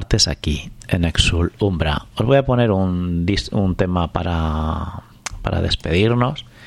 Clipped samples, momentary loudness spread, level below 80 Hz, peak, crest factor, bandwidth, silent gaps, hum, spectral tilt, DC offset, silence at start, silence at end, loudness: under 0.1%; 8 LU; -30 dBFS; -2 dBFS; 18 dB; 12.5 kHz; none; none; -5.5 dB/octave; under 0.1%; 0 s; 0 s; -19 LUFS